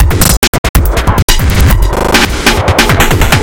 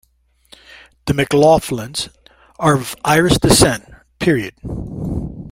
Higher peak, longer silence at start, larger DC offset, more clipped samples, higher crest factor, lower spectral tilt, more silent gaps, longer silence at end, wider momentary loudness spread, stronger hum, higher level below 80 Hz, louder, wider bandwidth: about the same, 0 dBFS vs 0 dBFS; second, 0 s vs 1.05 s; neither; first, 2% vs under 0.1%; second, 8 dB vs 18 dB; about the same, -4 dB/octave vs -4.5 dB/octave; first, 0.37-0.42 s, 0.48-0.74 s, 1.23-1.28 s vs none; about the same, 0 s vs 0.05 s; second, 3 LU vs 15 LU; neither; first, -12 dBFS vs -36 dBFS; first, -9 LUFS vs -16 LUFS; first, over 20 kHz vs 16.5 kHz